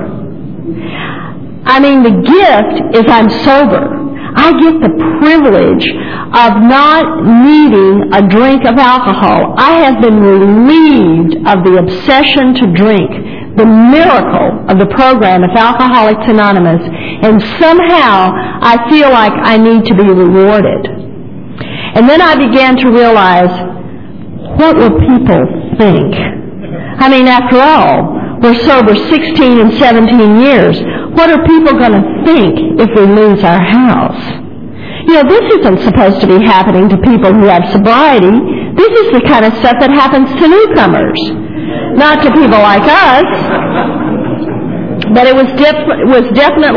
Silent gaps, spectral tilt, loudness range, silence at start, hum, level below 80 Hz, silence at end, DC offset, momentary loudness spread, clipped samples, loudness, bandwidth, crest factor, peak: none; -8 dB/octave; 2 LU; 0 s; none; -32 dBFS; 0 s; 2%; 12 LU; 4%; -6 LUFS; 5.4 kHz; 6 dB; 0 dBFS